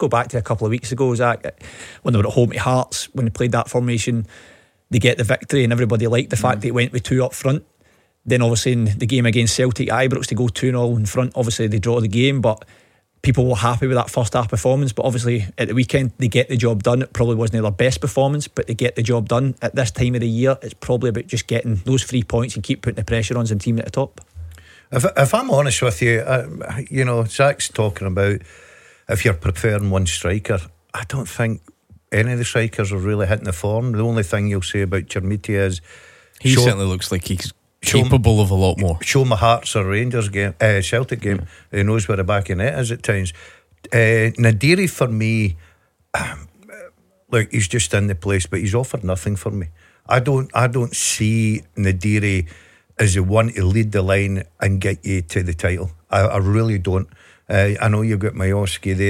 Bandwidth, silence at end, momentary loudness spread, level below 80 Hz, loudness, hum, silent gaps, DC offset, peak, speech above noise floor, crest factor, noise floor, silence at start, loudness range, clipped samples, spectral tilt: 15.5 kHz; 0 s; 8 LU; -40 dBFS; -19 LUFS; none; none; under 0.1%; -2 dBFS; 40 dB; 18 dB; -58 dBFS; 0 s; 3 LU; under 0.1%; -5.5 dB/octave